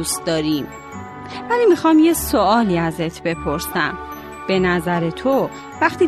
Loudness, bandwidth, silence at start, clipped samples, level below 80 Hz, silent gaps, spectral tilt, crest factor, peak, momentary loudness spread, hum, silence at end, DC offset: -18 LUFS; 13.5 kHz; 0 s; under 0.1%; -42 dBFS; none; -5 dB/octave; 16 dB; -2 dBFS; 17 LU; none; 0 s; under 0.1%